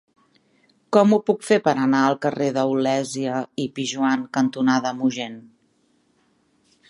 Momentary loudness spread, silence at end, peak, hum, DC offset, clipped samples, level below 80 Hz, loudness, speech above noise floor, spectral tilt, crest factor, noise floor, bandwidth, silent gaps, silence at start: 8 LU; 1.5 s; -2 dBFS; none; under 0.1%; under 0.1%; -72 dBFS; -21 LUFS; 43 dB; -5.5 dB/octave; 20 dB; -64 dBFS; 11.5 kHz; none; 0.9 s